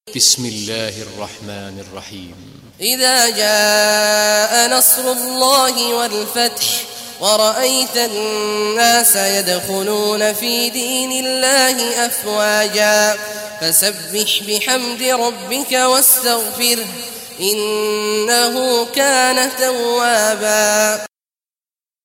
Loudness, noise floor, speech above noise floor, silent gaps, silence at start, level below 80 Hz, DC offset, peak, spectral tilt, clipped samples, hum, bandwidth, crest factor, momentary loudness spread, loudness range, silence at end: -14 LUFS; under -90 dBFS; over 74 dB; none; 0.05 s; -62 dBFS; under 0.1%; 0 dBFS; -0.5 dB/octave; under 0.1%; none; 16.5 kHz; 16 dB; 12 LU; 3 LU; 1 s